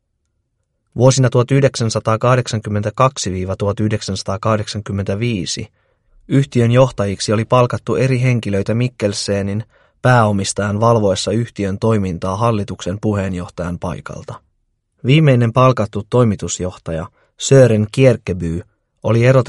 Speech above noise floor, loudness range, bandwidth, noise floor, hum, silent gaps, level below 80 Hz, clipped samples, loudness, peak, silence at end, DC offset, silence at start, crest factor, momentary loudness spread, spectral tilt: 53 dB; 4 LU; 11.5 kHz; -69 dBFS; none; none; -44 dBFS; under 0.1%; -16 LUFS; 0 dBFS; 0 s; under 0.1%; 0.95 s; 16 dB; 12 LU; -6 dB/octave